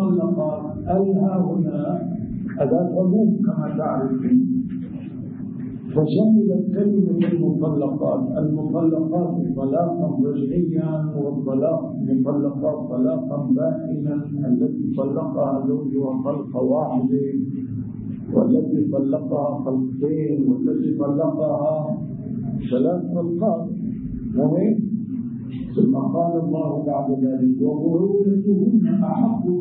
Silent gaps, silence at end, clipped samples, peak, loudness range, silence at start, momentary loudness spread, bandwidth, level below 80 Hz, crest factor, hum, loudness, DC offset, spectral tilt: none; 0 s; under 0.1%; -4 dBFS; 3 LU; 0 s; 9 LU; 4.3 kHz; -52 dBFS; 16 dB; none; -21 LUFS; under 0.1%; -14.5 dB/octave